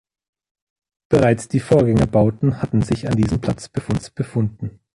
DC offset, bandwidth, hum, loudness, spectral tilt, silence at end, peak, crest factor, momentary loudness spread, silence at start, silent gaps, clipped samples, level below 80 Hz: under 0.1%; 11.5 kHz; none; -19 LUFS; -7.5 dB/octave; 0.25 s; -2 dBFS; 16 dB; 9 LU; 1.1 s; none; under 0.1%; -40 dBFS